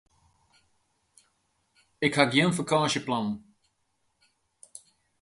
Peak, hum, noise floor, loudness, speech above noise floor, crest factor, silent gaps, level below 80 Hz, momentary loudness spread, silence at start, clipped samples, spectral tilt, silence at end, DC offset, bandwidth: -4 dBFS; none; -75 dBFS; -25 LUFS; 49 dB; 26 dB; none; -68 dBFS; 26 LU; 2 s; under 0.1%; -4.5 dB/octave; 1.8 s; under 0.1%; 11.5 kHz